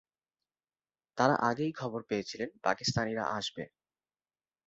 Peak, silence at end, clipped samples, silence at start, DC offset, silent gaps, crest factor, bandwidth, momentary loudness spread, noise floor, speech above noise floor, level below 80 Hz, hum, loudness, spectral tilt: -12 dBFS; 1 s; under 0.1%; 1.15 s; under 0.1%; none; 24 dB; 7.6 kHz; 12 LU; under -90 dBFS; over 58 dB; -66 dBFS; none; -32 LUFS; -3.5 dB/octave